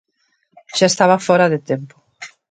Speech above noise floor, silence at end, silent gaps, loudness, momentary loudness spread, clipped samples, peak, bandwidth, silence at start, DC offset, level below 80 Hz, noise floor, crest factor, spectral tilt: 50 dB; 0.25 s; none; -16 LUFS; 23 LU; under 0.1%; 0 dBFS; 9.4 kHz; 0.75 s; under 0.1%; -66 dBFS; -65 dBFS; 18 dB; -4 dB/octave